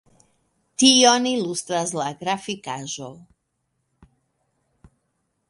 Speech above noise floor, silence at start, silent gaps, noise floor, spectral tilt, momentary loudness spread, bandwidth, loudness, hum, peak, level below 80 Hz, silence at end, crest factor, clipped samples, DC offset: 53 dB; 0.8 s; none; -74 dBFS; -2 dB/octave; 19 LU; 11.5 kHz; -20 LUFS; none; 0 dBFS; -66 dBFS; 2.3 s; 24 dB; under 0.1%; under 0.1%